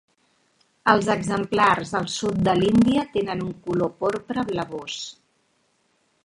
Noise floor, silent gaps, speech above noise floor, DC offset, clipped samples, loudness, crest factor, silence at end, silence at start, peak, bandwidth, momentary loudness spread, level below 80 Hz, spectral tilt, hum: -67 dBFS; none; 45 dB; under 0.1%; under 0.1%; -23 LUFS; 22 dB; 1.1 s; 0.85 s; 0 dBFS; 11.5 kHz; 11 LU; -52 dBFS; -5.5 dB/octave; none